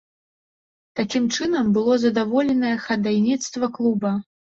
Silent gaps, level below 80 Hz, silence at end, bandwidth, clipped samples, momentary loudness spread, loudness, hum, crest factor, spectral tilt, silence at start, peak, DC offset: none; -60 dBFS; 0.35 s; 7.8 kHz; under 0.1%; 7 LU; -21 LUFS; none; 14 dB; -5 dB/octave; 0.95 s; -8 dBFS; under 0.1%